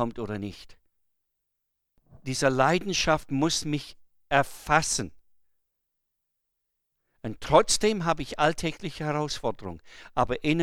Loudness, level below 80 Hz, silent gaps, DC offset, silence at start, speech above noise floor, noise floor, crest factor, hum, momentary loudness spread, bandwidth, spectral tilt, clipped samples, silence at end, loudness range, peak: -26 LUFS; -50 dBFS; none; under 0.1%; 0 s; 54 dB; -81 dBFS; 24 dB; none; 17 LU; 16.5 kHz; -4 dB/octave; under 0.1%; 0 s; 4 LU; -4 dBFS